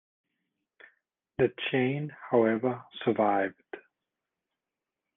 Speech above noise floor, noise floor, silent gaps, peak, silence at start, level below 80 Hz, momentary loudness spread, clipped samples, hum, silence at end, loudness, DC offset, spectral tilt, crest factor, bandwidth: 61 dB; -89 dBFS; none; -10 dBFS; 1.4 s; -70 dBFS; 18 LU; under 0.1%; none; 1.4 s; -29 LUFS; under 0.1%; -5 dB/octave; 22 dB; 3.9 kHz